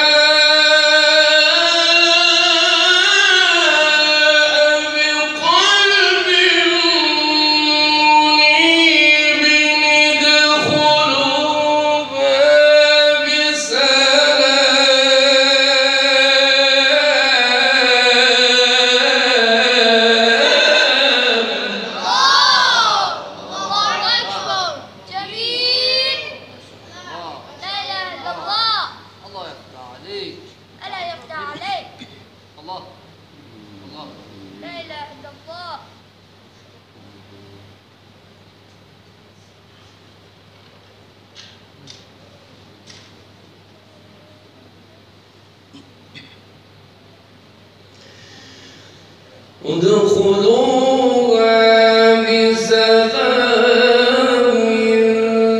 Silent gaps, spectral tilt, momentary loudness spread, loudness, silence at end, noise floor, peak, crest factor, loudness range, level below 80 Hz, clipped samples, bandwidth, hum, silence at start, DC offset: none; -1.5 dB/octave; 19 LU; -11 LUFS; 0 s; -47 dBFS; 0 dBFS; 14 dB; 14 LU; -64 dBFS; under 0.1%; 12 kHz; none; 0 s; under 0.1%